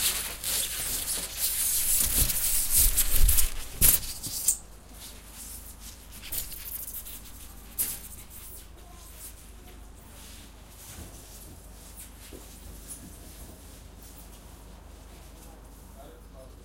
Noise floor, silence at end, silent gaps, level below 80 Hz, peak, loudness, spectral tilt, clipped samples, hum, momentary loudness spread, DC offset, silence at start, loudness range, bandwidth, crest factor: -47 dBFS; 0 s; none; -36 dBFS; -6 dBFS; -25 LUFS; -1 dB/octave; under 0.1%; none; 26 LU; under 0.1%; 0 s; 23 LU; 16.5 kHz; 24 dB